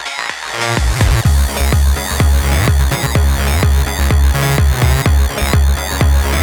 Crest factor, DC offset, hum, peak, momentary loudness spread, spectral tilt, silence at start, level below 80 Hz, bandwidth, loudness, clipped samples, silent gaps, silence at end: 12 dB; under 0.1%; none; 0 dBFS; 3 LU; -4.5 dB/octave; 0 s; -14 dBFS; over 20 kHz; -14 LUFS; under 0.1%; none; 0 s